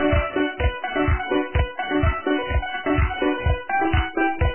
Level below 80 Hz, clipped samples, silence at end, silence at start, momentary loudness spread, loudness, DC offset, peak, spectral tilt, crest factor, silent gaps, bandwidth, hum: -26 dBFS; under 0.1%; 0 s; 0 s; 3 LU; -23 LUFS; under 0.1%; -8 dBFS; -10.5 dB/octave; 14 dB; none; 3.2 kHz; none